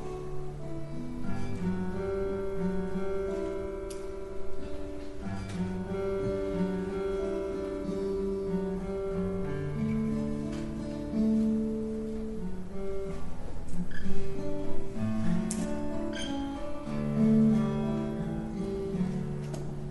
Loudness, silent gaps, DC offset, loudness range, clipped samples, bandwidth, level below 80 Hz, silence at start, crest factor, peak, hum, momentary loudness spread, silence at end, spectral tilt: -33 LUFS; none; under 0.1%; 6 LU; under 0.1%; 11.5 kHz; -42 dBFS; 0 s; 16 dB; -12 dBFS; none; 11 LU; 0 s; -7.5 dB/octave